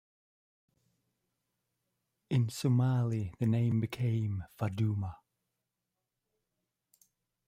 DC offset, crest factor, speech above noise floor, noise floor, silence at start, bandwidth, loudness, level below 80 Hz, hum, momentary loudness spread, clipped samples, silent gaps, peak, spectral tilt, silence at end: under 0.1%; 16 dB; 57 dB; -87 dBFS; 2.3 s; 14 kHz; -32 LUFS; -66 dBFS; none; 8 LU; under 0.1%; none; -20 dBFS; -7.5 dB/octave; 2.3 s